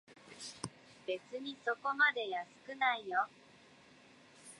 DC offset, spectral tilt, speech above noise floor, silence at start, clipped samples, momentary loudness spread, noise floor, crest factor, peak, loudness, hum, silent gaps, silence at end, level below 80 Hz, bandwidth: under 0.1%; -2.5 dB/octave; 25 dB; 0.1 s; under 0.1%; 18 LU; -62 dBFS; 22 dB; -18 dBFS; -36 LUFS; none; none; 0.05 s; -82 dBFS; 11.5 kHz